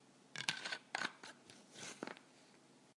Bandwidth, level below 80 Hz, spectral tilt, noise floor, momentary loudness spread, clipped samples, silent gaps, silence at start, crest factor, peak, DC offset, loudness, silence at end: 11.5 kHz; under -90 dBFS; -1 dB/octave; -67 dBFS; 23 LU; under 0.1%; none; 0 s; 34 dB; -16 dBFS; under 0.1%; -45 LUFS; 0.05 s